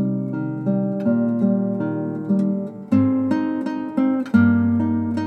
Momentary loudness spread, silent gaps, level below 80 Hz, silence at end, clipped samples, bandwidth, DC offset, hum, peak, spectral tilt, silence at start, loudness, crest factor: 8 LU; none; -66 dBFS; 0 s; under 0.1%; 6 kHz; under 0.1%; none; -4 dBFS; -10 dB/octave; 0 s; -21 LUFS; 16 dB